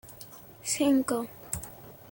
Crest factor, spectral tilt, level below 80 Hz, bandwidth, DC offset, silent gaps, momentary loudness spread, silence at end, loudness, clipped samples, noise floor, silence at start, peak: 18 dB; -3.5 dB/octave; -58 dBFS; 17 kHz; under 0.1%; none; 20 LU; 0.05 s; -29 LUFS; under 0.1%; -48 dBFS; 0.05 s; -12 dBFS